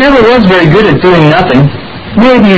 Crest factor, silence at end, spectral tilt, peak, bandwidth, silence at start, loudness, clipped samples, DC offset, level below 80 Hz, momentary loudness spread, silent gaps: 4 dB; 0 s; -7.5 dB/octave; 0 dBFS; 8 kHz; 0 s; -5 LUFS; 5%; under 0.1%; -28 dBFS; 7 LU; none